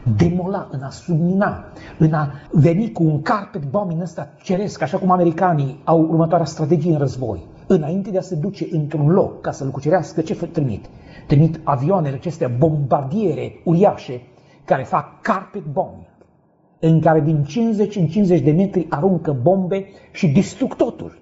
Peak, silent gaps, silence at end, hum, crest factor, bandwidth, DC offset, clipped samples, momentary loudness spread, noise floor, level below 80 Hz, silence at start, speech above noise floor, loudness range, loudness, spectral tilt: -2 dBFS; none; 0.1 s; none; 16 dB; 8 kHz; under 0.1%; under 0.1%; 10 LU; -56 dBFS; -48 dBFS; 0 s; 38 dB; 3 LU; -19 LUFS; -8.5 dB/octave